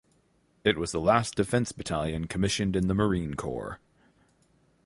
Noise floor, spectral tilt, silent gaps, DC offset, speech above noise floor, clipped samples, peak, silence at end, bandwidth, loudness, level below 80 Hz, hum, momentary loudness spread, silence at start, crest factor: -67 dBFS; -5 dB/octave; none; under 0.1%; 40 dB; under 0.1%; -8 dBFS; 1.1 s; 11.5 kHz; -28 LUFS; -48 dBFS; none; 10 LU; 0.65 s; 20 dB